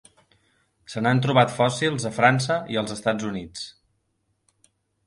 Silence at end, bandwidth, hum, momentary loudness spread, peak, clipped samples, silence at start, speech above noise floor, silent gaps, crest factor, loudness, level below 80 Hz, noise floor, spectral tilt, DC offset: 1.35 s; 11.5 kHz; none; 17 LU; -4 dBFS; under 0.1%; 0.9 s; 50 dB; none; 20 dB; -22 LUFS; -60 dBFS; -72 dBFS; -5 dB/octave; under 0.1%